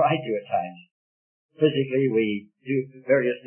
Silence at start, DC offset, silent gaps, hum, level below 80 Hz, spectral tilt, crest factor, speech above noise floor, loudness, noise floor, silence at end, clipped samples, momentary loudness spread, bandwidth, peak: 0 s; under 0.1%; 0.91-1.49 s; none; -74 dBFS; -11 dB/octave; 18 dB; over 66 dB; -25 LUFS; under -90 dBFS; 0.1 s; under 0.1%; 6 LU; 3.4 kHz; -6 dBFS